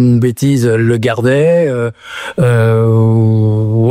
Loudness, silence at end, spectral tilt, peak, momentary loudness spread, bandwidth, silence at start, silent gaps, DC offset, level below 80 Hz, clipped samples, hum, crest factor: -12 LUFS; 0 s; -7.5 dB/octave; -2 dBFS; 7 LU; 13.5 kHz; 0 s; none; under 0.1%; -48 dBFS; under 0.1%; none; 8 dB